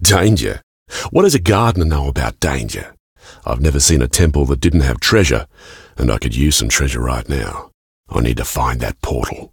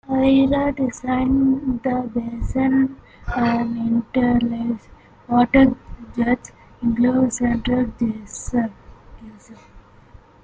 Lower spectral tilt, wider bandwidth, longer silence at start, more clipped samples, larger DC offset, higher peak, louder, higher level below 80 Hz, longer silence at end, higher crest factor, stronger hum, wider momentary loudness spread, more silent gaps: second, -4.5 dB/octave vs -6 dB/octave; first, 18 kHz vs 9.2 kHz; about the same, 0 s vs 0.1 s; neither; neither; about the same, 0 dBFS vs -2 dBFS; first, -16 LUFS vs -20 LUFS; first, -24 dBFS vs -38 dBFS; second, 0.05 s vs 0.65 s; about the same, 16 dB vs 18 dB; neither; first, 14 LU vs 10 LU; first, 0.63-0.86 s, 3.00-3.16 s, 7.74-8.04 s vs none